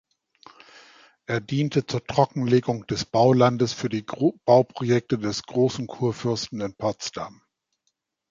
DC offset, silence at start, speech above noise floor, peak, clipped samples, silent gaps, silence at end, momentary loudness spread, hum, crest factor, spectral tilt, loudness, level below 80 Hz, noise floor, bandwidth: under 0.1%; 1.3 s; 53 dB; -4 dBFS; under 0.1%; none; 1 s; 10 LU; none; 20 dB; -6 dB/octave; -24 LUFS; -58 dBFS; -76 dBFS; 7.6 kHz